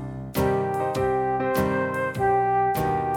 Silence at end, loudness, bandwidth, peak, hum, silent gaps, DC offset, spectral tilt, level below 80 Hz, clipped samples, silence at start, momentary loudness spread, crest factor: 0 s; -24 LUFS; 18 kHz; -10 dBFS; none; none; under 0.1%; -6.5 dB/octave; -46 dBFS; under 0.1%; 0 s; 4 LU; 14 dB